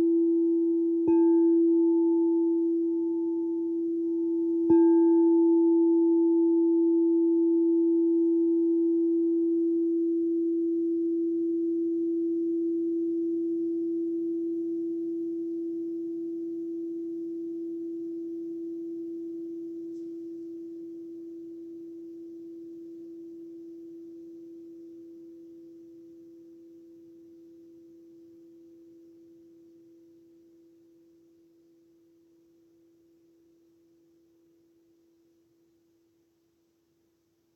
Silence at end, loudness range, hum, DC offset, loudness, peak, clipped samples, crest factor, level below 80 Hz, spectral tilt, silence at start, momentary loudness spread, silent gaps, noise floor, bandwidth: 10.75 s; 22 LU; none; under 0.1%; -26 LUFS; -14 dBFS; under 0.1%; 16 dB; -80 dBFS; -10.5 dB/octave; 0 s; 22 LU; none; -71 dBFS; 1.7 kHz